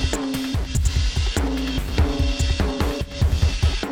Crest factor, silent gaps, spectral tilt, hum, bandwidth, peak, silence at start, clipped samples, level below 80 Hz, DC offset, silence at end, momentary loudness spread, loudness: 14 dB; none; -5 dB/octave; none; 16 kHz; -6 dBFS; 0 s; under 0.1%; -24 dBFS; under 0.1%; 0 s; 4 LU; -23 LUFS